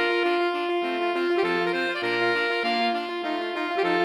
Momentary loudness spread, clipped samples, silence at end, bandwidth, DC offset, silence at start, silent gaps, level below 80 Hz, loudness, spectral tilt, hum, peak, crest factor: 5 LU; under 0.1%; 0 s; 11.5 kHz; under 0.1%; 0 s; none; -76 dBFS; -25 LUFS; -4.5 dB/octave; none; -12 dBFS; 14 dB